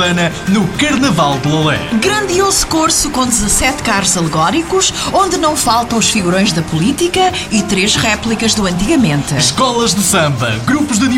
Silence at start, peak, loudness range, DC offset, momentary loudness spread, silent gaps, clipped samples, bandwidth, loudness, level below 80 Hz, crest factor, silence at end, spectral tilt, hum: 0 s; 0 dBFS; 1 LU; 0.3%; 3 LU; none; under 0.1%; 16.5 kHz; -12 LUFS; -32 dBFS; 12 dB; 0 s; -3.5 dB/octave; none